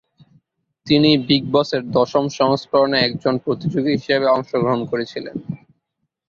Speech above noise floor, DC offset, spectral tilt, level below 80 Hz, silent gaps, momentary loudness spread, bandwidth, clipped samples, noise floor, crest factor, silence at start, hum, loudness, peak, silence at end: 57 dB; under 0.1%; -6 dB/octave; -56 dBFS; none; 13 LU; 7.2 kHz; under 0.1%; -75 dBFS; 16 dB; 0.85 s; none; -18 LUFS; -2 dBFS; 0.75 s